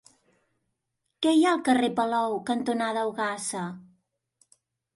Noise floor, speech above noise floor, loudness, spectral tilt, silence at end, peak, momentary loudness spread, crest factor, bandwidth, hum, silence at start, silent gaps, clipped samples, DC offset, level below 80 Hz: -80 dBFS; 55 dB; -26 LUFS; -4 dB/octave; 1.15 s; -12 dBFS; 11 LU; 16 dB; 11.5 kHz; none; 1.2 s; none; under 0.1%; under 0.1%; -74 dBFS